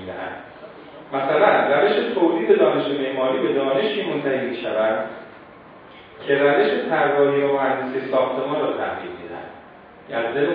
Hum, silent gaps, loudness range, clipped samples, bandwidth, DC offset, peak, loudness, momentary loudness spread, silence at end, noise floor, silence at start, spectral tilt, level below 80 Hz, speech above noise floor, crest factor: none; none; 4 LU; under 0.1%; 5 kHz; under 0.1%; -2 dBFS; -20 LUFS; 18 LU; 0 s; -44 dBFS; 0 s; -8.5 dB/octave; -66 dBFS; 24 dB; 20 dB